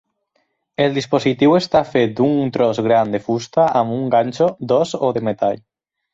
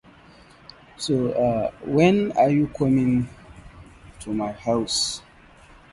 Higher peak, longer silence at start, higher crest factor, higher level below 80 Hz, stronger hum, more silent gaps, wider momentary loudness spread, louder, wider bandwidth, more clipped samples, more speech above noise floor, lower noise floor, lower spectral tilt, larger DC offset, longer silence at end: about the same, -2 dBFS vs -4 dBFS; second, 0.8 s vs 1 s; about the same, 14 dB vs 18 dB; second, -56 dBFS vs -50 dBFS; neither; neither; second, 5 LU vs 12 LU; first, -17 LUFS vs -22 LUFS; second, 7.8 kHz vs 11.5 kHz; neither; first, 51 dB vs 29 dB; first, -67 dBFS vs -50 dBFS; about the same, -6.5 dB/octave vs -5.5 dB/octave; neither; second, 0.55 s vs 0.75 s